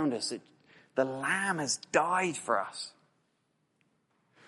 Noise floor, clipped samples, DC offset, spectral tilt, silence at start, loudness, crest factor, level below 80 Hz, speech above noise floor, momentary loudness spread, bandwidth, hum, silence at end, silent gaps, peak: -76 dBFS; under 0.1%; under 0.1%; -3 dB/octave; 0 s; -31 LUFS; 24 dB; -80 dBFS; 44 dB; 12 LU; 11.5 kHz; none; 1.55 s; none; -10 dBFS